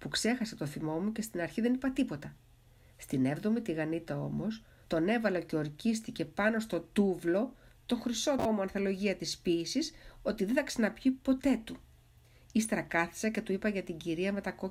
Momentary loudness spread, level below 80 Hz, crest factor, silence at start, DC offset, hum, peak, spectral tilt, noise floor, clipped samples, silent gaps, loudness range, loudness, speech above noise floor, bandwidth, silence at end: 7 LU; -60 dBFS; 20 dB; 0 s; under 0.1%; none; -14 dBFS; -5 dB/octave; -61 dBFS; under 0.1%; none; 2 LU; -33 LUFS; 28 dB; 16 kHz; 0 s